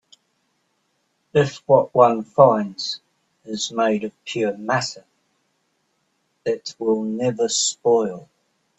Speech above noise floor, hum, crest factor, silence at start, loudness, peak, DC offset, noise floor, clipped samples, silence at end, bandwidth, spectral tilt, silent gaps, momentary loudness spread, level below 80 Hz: 50 dB; none; 22 dB; 1.35 s; -20 LUFS; 0 dBFS; under 0.1%; -70 dBFS; under 0.1%; 0.6 s; 8.4 kHz; -4 dB/octave; none; 13 LU; -66 dBFS